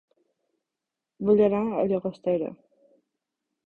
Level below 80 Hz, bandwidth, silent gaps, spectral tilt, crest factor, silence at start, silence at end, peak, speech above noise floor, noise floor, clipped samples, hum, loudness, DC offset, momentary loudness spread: -64 dBFS; 4.5 kHz; none; -10 dB/octave; 18 dB; 1.2 s; 1.1 s; -10 dBFS; 63 dB; -87 dBFS; under 0.1%; none; -25 LUFS; under 0.1%; 9 LU